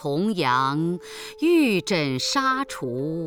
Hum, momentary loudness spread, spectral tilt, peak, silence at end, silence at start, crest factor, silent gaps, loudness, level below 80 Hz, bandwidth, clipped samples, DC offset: none; 9 LU; -5 dB/octave; -8 dBFS; 0 s; 0 s; 16 dB; none; -23 LUFS; -60 dBFS; 19 kHz; under 0.1%; under 0.1%